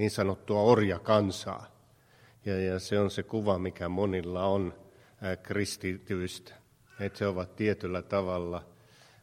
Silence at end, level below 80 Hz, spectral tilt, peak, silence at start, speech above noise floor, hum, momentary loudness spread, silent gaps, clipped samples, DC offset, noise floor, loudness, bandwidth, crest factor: 0.6 s; -60 dBFS; -6 dB/octave; -8 dBFS; 0 s; 31 dB; none; 13 LU; none; under 0.1%; under 0.1%; -61 dBFS; -31 LUFS; 16 kHz; 22 dB